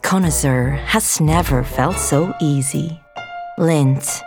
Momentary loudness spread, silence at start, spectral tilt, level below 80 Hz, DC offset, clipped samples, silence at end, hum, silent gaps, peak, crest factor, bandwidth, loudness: 13 LU; 0.05 s; -5 dB/octave; -30 dBFS; under 0.1%; under 0.1%; 0 s; none; none; -2 dBFS; 16 dB; 19 kHz; -17 LUFS